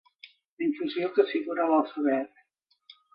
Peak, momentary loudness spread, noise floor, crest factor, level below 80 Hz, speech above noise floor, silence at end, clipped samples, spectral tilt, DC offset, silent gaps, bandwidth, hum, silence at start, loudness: -10 dBFS; 6 LU; -62 dBFS; 20 dB; -82 dBFS; 36 dB; 0.9 s; under 0.1%; -8 dB/octave; under 0.1%; 0.45-0.57 s; 5.6 kHz; none; 0.25 s; -27 LUFS